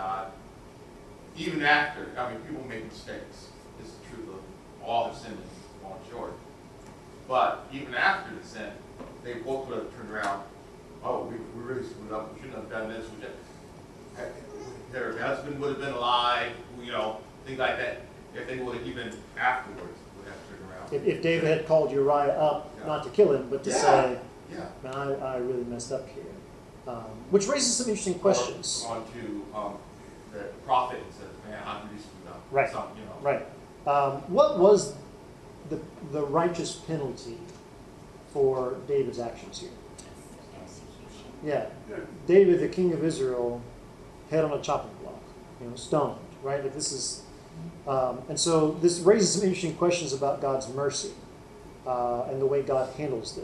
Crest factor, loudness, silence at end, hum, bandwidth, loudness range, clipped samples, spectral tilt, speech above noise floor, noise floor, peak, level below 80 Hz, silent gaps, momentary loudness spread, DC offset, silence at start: 22 dB; -28 LUFS; 0 s; none; 12.5 kHz; 11 LU; under 0.1%; -4 dB/octave; 20 dB; -48 dBFS; -8 dBFS; -56 dBFS; none; 23 LU; under 0.1%; 0 s